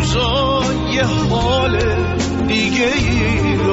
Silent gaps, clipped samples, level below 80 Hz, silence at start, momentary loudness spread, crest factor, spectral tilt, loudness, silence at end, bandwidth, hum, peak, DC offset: none; under 0.1%; -26 dBFS; 0 s; 2 LU; 10 dB; -4.5 dB/octave; -16 LUFS; 0 s; 8 kHz; none; -6 dBFS; under 0.1%